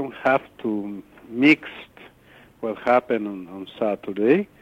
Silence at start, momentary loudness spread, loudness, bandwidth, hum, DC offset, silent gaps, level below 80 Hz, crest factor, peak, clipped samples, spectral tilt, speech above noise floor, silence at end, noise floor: 0 s; 18 LU; -22 LUFS; 8 kHz; none; under 0.1%; none; -64 dBFS; 20 dB; -4 dBFS; under 0.1%; -7 dB/octave; 29 dB; 0.15 s; -52 dBFS